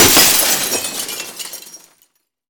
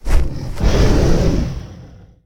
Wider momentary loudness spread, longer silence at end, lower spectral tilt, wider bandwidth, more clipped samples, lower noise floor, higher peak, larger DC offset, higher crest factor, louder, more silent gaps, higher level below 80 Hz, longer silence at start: first, 20 LU vs 13 LU; first, 0.75 s vs 0.4 s; second, -0.5 dB/octave vs -6.5 dB/octave; first, over 20 kHz vs 13 kHz; neither; first, -60 dBFS vs -39 dBFS; about the same, 0 dBFS vs 0 dBFS; neither; about the same, 16 dB vs 14 dB; first, -12 LUFS vs -18 LUFS; neither; second, -44 dBFS vs -18 dBFS; about the same, 0 s vs 0.05 s